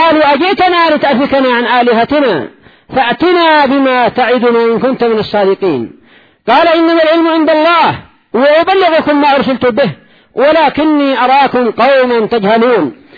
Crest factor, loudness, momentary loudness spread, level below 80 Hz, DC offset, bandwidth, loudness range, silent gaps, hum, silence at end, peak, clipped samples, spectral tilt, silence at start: 10 dB; -9 LUFS; 6 LU; -48 dBFS; under 0.1%; 5.4 kHz; 1 LU; none; none; 0.25 s; 0 dBFS; under 0.1%; -7 dB/octave; 0 s